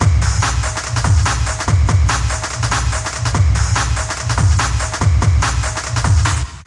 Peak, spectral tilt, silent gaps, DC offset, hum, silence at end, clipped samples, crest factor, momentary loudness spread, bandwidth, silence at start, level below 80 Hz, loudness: 0 dBFS; -4 dB/octave; none; under 0.1%; none; 0.05 s; under 0.1%; 14 dB; 5 LU; 11.5 kHz; 0 s; -20 dBFS; -16 LUFS